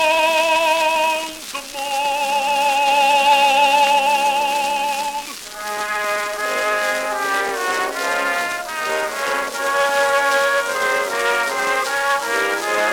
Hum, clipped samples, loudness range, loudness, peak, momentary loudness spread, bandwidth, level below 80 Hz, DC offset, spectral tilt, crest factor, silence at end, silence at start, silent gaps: none; under 0.1%; 5 LU; -18 LUFS; -4 dBFS; 9 LU; 18 kHz; -56 dBFS; under 0.1%; 0 dB/octave; 16 dB; 0 s; 0 s; none